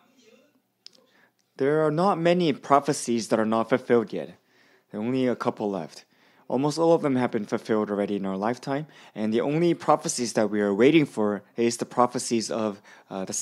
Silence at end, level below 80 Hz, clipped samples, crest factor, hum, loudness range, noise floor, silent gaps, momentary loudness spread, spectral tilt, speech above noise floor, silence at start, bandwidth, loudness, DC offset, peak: 0 s; -76 dBFS; under 0.1%; 22 dB; none; 3 LU; -64 dBFS; none; 11 LU; -5 dB/octave; 40 dB; 1.6 s; 14 kHz; -25 LUFS; under 0.1%; -4 dBFS